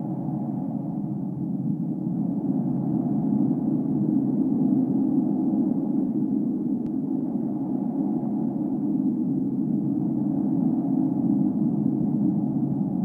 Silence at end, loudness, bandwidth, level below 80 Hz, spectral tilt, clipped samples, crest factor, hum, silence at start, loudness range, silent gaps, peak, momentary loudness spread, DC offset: 0 s; -25 LUFS; 1.8 kHz; -62 dBFS; -13 dB/octave; under 0.1%; 14 dB; none; 0 s; 3 LU; none; -10 dBFS; 6 LU; under 0.1%